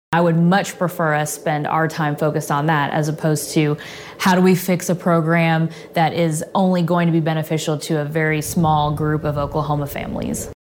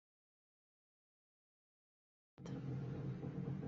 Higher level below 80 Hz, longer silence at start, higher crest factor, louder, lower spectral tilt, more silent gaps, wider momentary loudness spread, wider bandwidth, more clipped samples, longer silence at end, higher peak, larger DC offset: first, -46 dBFS vs -72 dBFS; second, 0.1 s vs 2.4 s; about the same, 16 dB vs 16 dB; first, -19 LUFS vs -47 LUFS; second, -6 dB/octave vs -9 dB/octave; neither; about the same, 6 LU vs 5 LU; first, 17 kHz vs 7.2 kHz; neither; about the same, 0.1 s vs 0 s; first, -4 dBFS vs -34 dBFS; neither